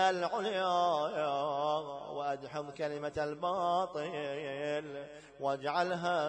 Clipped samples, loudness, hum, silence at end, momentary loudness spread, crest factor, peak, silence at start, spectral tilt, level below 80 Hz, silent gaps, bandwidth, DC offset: under 0.1%; -35 LUFS; none; 0 s; 9 LU; 16 dB; -18 dBFS; 0 s; -4.5 dB/octave; -70 dBFS; none; 9.8 kHz; under 0.1%